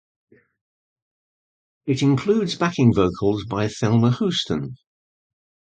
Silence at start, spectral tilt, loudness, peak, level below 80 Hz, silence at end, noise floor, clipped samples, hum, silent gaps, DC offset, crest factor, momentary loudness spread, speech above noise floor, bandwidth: 1.85 s; -6.5 dB/octave; -21 LUFS; -4 dBFS; -50 dBFS; 1 s; under -90 dBFS; under 0.1%; none; none; under 0.1%; 18 dB; 9 LU; over 70 dB; 9.2 kHz